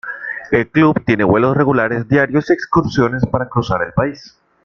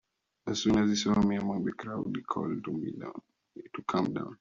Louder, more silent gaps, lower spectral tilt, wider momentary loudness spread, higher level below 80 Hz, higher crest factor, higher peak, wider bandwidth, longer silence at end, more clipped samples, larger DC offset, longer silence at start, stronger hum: first, -15 LUFS vs -31 LUFS; neither; first, -8 dB/octave vs -5.5 dB/octave; second, 5 LU vs 17 LU; first, -42 dBFS vs -60 dBFS; about the same, 14 dB vs 16 dB; first, -2 dBFS vs -14 dBFS; about the same, 7 kHz vs 7.4 kHz; first, 0.35 s vs 0.05 s; neither; neither; second, 0.05 s vs 0.45 s; neither